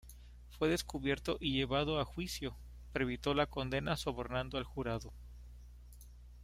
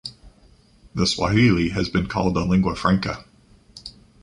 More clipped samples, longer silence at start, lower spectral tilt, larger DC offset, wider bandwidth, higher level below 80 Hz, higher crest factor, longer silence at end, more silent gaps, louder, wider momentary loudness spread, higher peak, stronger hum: neither; about the same, 0.05 s vs 0.05 s; about the same, -5 dB/octave vs -6 dB/octave; neither; first, 16 kHz vs 11 kHz; second, -50 dBFS vs -40 dBFS; about the same, 20 dB vs 18 dB; second, 0 s vs 0.35 s; neither; second, -37 LUFS vs -21 LUFS; about the same, 22 LU vs 22 LU; second, -18 dBFS vs -4 dBFS; first, 60 Hz at -50 dBFS vs none